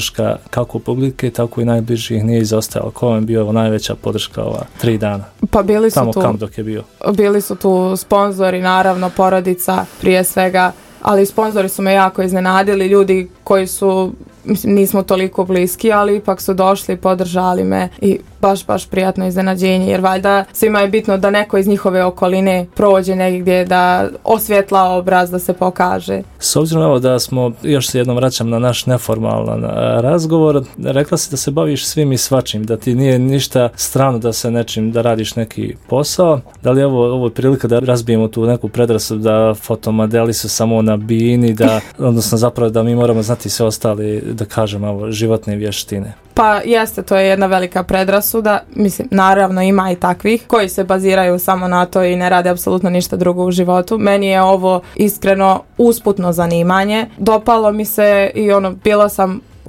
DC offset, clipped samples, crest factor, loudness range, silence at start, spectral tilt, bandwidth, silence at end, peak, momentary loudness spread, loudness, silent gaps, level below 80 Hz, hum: under 0.1%; under 0.1%; 14 dB; 3 LU; 0 s; -5.5 dB/octave; 17 kHz; 0 s; 0 dBFS; 6 LU; -14 LUFS; none; -42 dBFS; none